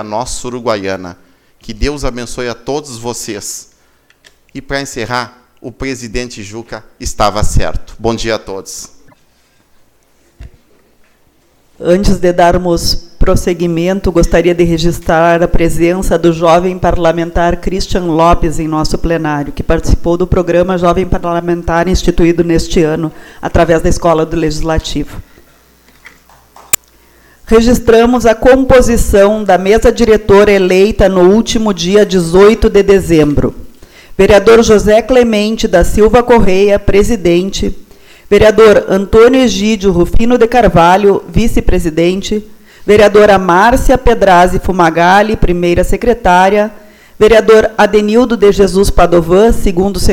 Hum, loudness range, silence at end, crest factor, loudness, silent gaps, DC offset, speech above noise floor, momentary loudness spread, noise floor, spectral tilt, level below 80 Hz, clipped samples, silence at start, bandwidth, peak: none; 12 LU; 0 s; 10 dB; -10 LUFS; none; under 0.1%; 42 dB; 13 LU; -50 dBFS; -5.5 dB/octave; -20 dBFS; 0.8%; 0 s; over 20 kHz; 0 dBFS